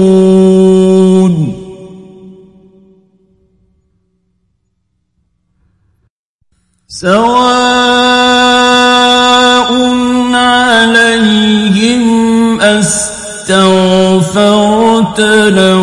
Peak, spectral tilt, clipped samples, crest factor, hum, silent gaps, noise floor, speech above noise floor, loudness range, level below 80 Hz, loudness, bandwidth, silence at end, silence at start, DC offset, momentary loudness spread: 0 dBFS; -4.5 dB/octave; 0.3%; 8 dB; none; 6.10-6.39 s; -63 dBFS; 57 dB; 8 LU; -42 dBFS; -7 LUFS; 11.5 kHz; 0 s; 0 s; under 0.1%; 5 LU